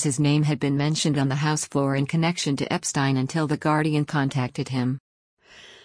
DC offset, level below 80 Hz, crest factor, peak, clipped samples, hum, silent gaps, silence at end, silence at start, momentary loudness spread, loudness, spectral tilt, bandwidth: under 0.1%; -60 dBFS; 14 dB; -8 dBFS; under 0.1%; none; 5.00-5.37 s; 0.1 s; 0 s; 5 LU; -24 LUFS; -5 dB/octave; 10.5 kHz